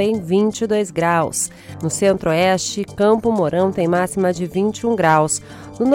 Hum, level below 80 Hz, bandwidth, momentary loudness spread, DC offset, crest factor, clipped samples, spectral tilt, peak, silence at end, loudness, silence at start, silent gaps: none; -50 dBFS; 17 kHz; 8 LU; under 0.1%; 14 dB; under 0.1%; -5 dB/octave; -4 dBFS; 0 s; -18 LUFS; 0 s; none